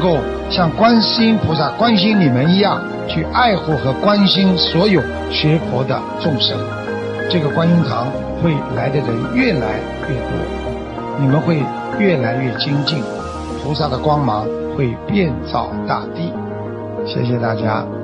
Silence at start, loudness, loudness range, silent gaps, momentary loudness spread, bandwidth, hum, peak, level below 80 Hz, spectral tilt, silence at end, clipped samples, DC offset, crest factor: 0 s; -17 LUFS; 5 LU; none; 10 LU; 9.2 kHz; none; -2 dBFS; -36 dBFS; -7.5 dB/octave; 0 s; under 0.1%; under 0.1%; 14 dB